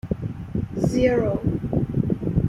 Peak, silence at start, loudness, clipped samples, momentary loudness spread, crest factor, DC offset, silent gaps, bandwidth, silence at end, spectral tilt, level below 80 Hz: -8 dBFS; 0.05 s; -24 LUFS; under 0.1%; 10 LU; 16 dB; under 0.1%; none; 12.5 kHz; 0 s; -8.5 dB/octave; -38 dBFS